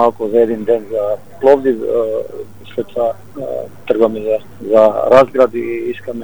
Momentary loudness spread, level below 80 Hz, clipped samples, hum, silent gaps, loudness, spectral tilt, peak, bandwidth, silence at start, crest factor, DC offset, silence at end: 14 LU; -52 dBFS; 0.3%; none; none; -15 LUFS; -7 dB/octave; 0 dBFS; 18.5 kHz; 0 s; 14 dB; 2%; 0 s